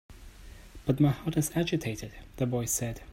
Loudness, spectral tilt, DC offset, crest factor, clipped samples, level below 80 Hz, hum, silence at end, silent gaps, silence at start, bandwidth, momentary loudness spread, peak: -30 LUFS; -5.5 dB/octave; under 0.1%; 18 dB; under 0.1%; -50 dBFS; none; 0 s; none; 0.1 s; 16 kHz; 13 LU; -12 dBFS